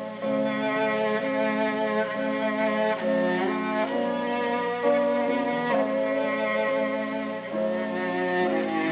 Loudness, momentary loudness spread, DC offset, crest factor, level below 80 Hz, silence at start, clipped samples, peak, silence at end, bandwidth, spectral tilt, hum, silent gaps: -26 LUFS; 3 LU; under 0.1%; 14 dB; -76 dBFS; 0 s; under 0.1%; -12 dBFS; 0 s; 4 kHz; -9 dB/octave; none; none